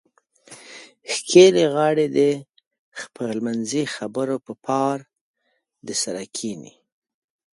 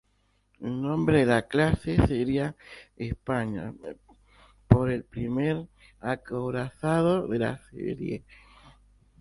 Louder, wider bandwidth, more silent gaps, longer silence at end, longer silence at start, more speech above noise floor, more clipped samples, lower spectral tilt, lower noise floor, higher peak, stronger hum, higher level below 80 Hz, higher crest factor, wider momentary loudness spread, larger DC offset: first, -21 LUFS vs -27 LUFS; about the same, 11.5 kHz vs 11.5 kHz; first, 2.67-2.71 s, 2.79-2.92 s, 5.21-5.34 s vs none; second, 0.85 s vs 1 s; about the same, 0.5 s vs 0.6 s; first, 52 dB vs 42 dB; neither; second, -4 dB/octave vs -8 dB/octave; about the same, -72 dBFS vs -69 dBFS; about the same, 0 dBFS vs 0 dBFS; neither; second, -70 dBFS vs -44 dBFS; second, 22 dB vs 28 dB; first, 24 LU vs 16 LU; neither